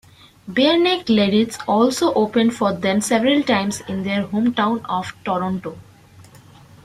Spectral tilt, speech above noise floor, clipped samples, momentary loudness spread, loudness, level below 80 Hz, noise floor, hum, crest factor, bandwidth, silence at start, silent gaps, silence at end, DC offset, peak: -4.5 dB/octave; 27 dB; under 0.1%; 9 LU; -19 LUFS; -56 dBFS; -46 dBFS; none; 16 dB; 15 kHz; 0.45 s; none; 0.65 s; under 0.1%; -4 dBFS